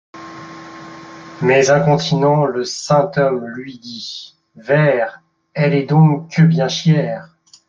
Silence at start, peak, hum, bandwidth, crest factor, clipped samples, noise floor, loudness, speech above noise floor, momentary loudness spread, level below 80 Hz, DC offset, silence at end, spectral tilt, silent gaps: 0.15 s; -2 dBFS; none; 7.6 kHz; 14 dB; under 0.1%; -35 dBFS; -15 LUFS; 21 dB; 21 LU; -58 dBFS; under 0.1%; 0.45 s; -6 dB/octave; none